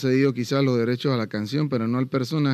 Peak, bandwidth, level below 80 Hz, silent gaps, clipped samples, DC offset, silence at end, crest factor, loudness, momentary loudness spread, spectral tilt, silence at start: -10 dBFS; 14 kHz; -72 dBFS; none; under 0.1%; under 0.1%; 0 s; 12 dB; -23 LUFS; 4 LU; -7 dB/octave; 0 s